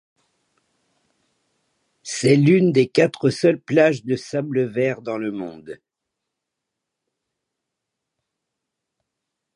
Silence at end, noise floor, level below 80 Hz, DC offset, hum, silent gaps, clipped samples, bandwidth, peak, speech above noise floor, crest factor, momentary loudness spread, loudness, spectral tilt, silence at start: 3.8 s; -82 dBFS; -68 dBFS; under 0.1%; none; none; under 0.1%; 11 kHz; -2 dBFS; 63 dB; 20 dB; 18 LU; -19 LUFS; -6 dB/octave; 2.05 s